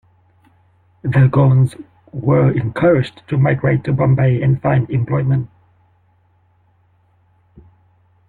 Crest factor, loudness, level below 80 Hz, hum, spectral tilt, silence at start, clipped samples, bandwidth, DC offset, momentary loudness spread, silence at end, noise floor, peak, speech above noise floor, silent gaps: 14 dB; -16 LUFS; -48 dBFS; none; -10 dB/octave; 1.05 s; under 0.1%; 4.3 kHz; under 0.1%; 8 LU; 2.8 s; -57 dBFS; -2 dBFS; 42 dB; none